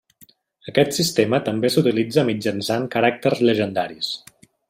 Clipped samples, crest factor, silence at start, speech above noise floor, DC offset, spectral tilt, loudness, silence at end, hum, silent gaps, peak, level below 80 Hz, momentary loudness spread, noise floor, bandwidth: under 0.1%; 18 dB; 0.65 s; 34 dB; under 0.1%; -5 dB/octave; -20 LUFS; 0.5 s; none; none; -2 dBFS; -62 dBFS; 8 LU; -54 dBFS; 16 kHz